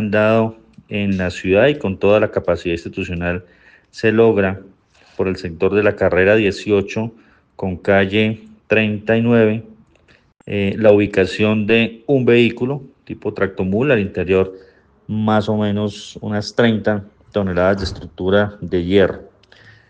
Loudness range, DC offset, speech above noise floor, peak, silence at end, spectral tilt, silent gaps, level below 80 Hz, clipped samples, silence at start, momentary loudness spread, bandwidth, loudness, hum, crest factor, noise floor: 3 LU; under 0.1%; 37 dB; 0 dBFS; 0.65 s; -7 dB/octave; none; -48 dBFS; under 0.1%; 0 s; 12 LU; 9 kHz; -17 LUFS; none; 16 dB; -53 dBFS